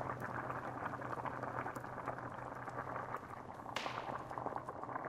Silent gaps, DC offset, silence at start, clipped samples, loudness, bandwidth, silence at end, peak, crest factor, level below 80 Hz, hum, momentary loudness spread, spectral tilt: none; under 0.1%; 0 s; under 0.1%; -44 LUFS; 15.5 kHz; 0 s; -24 dBFS; 20 dB; -68 dBFS; none; 4 LU; -5.5 dB/octave